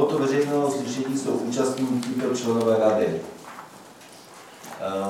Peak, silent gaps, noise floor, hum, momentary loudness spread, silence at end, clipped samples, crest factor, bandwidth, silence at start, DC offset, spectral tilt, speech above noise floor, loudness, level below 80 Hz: -6 dBFS; none; -46 dBFS; none; 23 LU; 0 s; under 0.1%; 18 dB; 16.5 kHz; 0 s; under 0.1%; -5.5 dB/octave; 23 dB; -24 LUFS; -70 dBFS